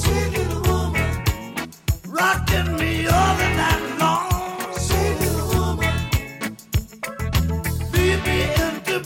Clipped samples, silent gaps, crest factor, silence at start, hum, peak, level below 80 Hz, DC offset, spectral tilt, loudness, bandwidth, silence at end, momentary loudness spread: under 0.1%; none; 16 dB; 0 s; none; -4 dBFS; -28 dBFS; under 0.1%; -5 dB/octave; -21 LUFS; 17 kHz; 0 s; 8 LU